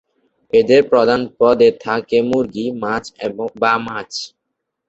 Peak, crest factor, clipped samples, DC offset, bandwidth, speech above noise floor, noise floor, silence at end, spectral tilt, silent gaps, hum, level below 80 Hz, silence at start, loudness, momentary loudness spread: -2 dBFS; 16 dB; under 0.1%; under 0.1%; 8 kHz; 61 dB; -76 dBFS; 0.6 s; -5 dB/octave; none; none; -54 dBFS; 0.55 s; -16 LUFS; 13 LU